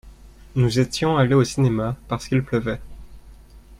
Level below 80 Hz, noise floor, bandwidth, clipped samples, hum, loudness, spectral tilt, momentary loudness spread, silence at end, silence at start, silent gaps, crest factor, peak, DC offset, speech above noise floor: -42 dBFS; -45 dBFS; 12.5 kHz; under 0.1%; none; -21 LUFS; -6.5 dB/octave; 11 LU; 0.05 s; 0.05 s; none; 18 dB; -4 dBFS; under 0.1%; 25 dB